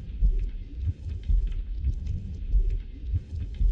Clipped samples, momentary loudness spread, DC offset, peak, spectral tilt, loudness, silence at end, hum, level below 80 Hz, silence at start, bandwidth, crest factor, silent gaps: under 0.1%; 6 LU; under 0.1%; -14 dBFS; -9 dB/octave; -32 LUFS; 0 s; none; -28 dBFS; 0 s; 3.9 kHz; 12 dB; none